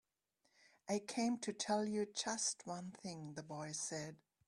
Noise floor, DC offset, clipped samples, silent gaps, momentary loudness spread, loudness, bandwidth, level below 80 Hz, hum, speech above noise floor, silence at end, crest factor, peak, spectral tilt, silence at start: -83 dBFS; under 0.1%; under 0.1%; none; 11 LU; -42 LUFS; 12.5 kHz; -84 dBFS; none; 41 dB; 0.3 s; 20 dB; -24 dBFS; -3.5 dB/octave; 0.85 s